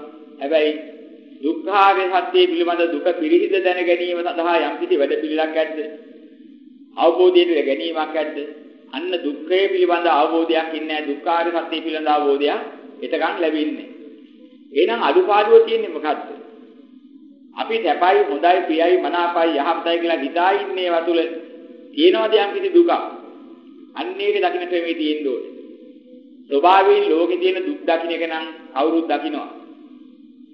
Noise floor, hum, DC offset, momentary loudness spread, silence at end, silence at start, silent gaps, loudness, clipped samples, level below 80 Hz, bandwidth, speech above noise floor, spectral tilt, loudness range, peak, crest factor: -45 dBFS; none; under 0.1%; 15 LU; 0.5 s; 0 s; none; -18 LUFS; under 0.1%; -82 dBFS; 5.6 kHz; 27 dB; -5.5 dB/octave; 4 LU; 0 dBFS; 18 dB